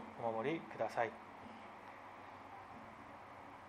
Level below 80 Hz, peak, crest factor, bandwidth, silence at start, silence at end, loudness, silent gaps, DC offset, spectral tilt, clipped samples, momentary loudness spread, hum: -78 dBFS; -22 dBFS; 24 dB; 15 kHz; 0 s; 0 s; -46 LUFS; none; under 0.1%; -6 dB/octave; under 0.1%; 15 LU; none